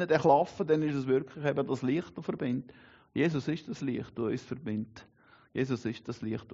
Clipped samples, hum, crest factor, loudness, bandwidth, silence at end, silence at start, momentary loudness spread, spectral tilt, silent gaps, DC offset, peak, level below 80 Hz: under 0.1%; none; 20 dB; -32 LUFS; 7.6 kHz; 0 s; 0 s; 11 LU; -6 dB/octave; none; under 0.1%; -12 dBFS; -68 dBFS